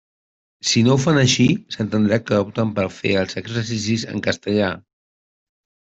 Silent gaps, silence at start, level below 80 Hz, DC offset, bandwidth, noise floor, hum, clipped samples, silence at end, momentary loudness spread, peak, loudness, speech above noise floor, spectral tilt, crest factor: none; 0.65 s; -54 dBFS; under 0.1%; 8.2 kHz; under -90 dBFS; none; under 0.1%; 1.1 s; 9 LU; -4 dBFS; -19 LUFS; over 71 dB; -5 dB/octave; 16 dB